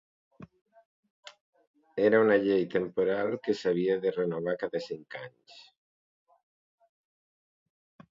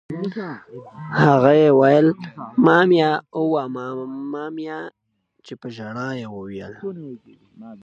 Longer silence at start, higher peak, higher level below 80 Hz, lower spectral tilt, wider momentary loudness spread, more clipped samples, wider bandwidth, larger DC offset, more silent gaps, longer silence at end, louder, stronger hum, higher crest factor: first, 0.4 s vs 0.1 s; second, -10 dBFS vs 0 dBFS; second, -74 dBFS vs -64 dBFS; about the same, -7 dB/octave vs -8 dB/octave; second, 17 LU vs 23 LU; neither; about the same, 7.6 kHz vs 7.8 kHz; neither; first, 0.61-0.65 s, 0.85-1.03 s, 1.10-1.23 s, 1.41-1.53 s, 1.67-1.74 s vs none; first, 2.55 s vs 0.05 s; second, -28 LUFS vs -18 LUFS; neither; about the same, 20 dB vs 20 dB